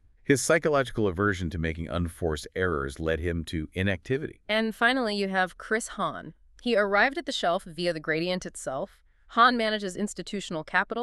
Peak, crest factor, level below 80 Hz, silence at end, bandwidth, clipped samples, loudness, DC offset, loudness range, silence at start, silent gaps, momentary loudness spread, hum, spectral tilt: -6 dBFS; 20 dB; -46 dBFS; 0 s; 13.5 kHz; under 0.1%; -27 LUFS; under 0.1%; 3 LU; 0.3 s; none; 11 LU; none; -4.5 dB/octave